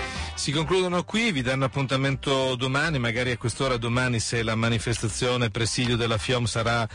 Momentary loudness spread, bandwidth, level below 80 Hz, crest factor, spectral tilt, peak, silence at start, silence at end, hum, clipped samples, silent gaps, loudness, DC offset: 2 LU; 10.5 kHz; -44 dBFS; 12 dB; -4.5 dB/octave; -14 dBFS; 0 s; 0 s; none; under 0.1%; none; -25 LUFS; under 0.1%